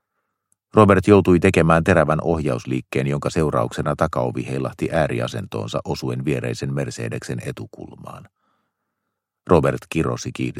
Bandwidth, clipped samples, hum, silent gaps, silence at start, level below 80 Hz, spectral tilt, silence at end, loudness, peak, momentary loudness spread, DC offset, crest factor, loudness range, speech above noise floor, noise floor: 15 kHz; under 0.1%; none; none; 0.75 s; -44 dBFS; -7 dB/octave; 0 s; -20 LUFS; 0 dBFS; 15 LU; under 0.1%; 20 dB; 11 LU; 60 dB; -79 dBFS